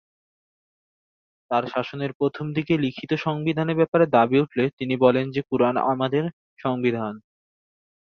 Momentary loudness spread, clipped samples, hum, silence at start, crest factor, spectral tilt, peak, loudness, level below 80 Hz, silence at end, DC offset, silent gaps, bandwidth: 10 LU; under 0.1%; none; 1.5 s; 20 dB; -8.5 dB/octave; -4 dBFS; -23 LUFS; -64 dBFS; 0.8 s; under 0.1%; 2.15-2.20 s, 3.88-3.92 s, 4.73-4.77 s, 6.33-6.57 s; 6.6 kHz